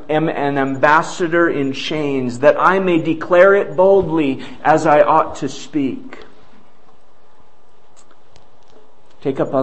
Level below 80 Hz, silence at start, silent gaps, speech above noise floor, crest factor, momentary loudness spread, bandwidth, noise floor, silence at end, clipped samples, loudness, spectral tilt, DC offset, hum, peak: -52 dBFS; 0 s; none; 38 dB; 16 dB; 11 LU; 8.6 kHz; -53 dBFS; 0 s; under 0.1%; -15 LUFS; -6 dB/octave; 3%; none; 0 dBFS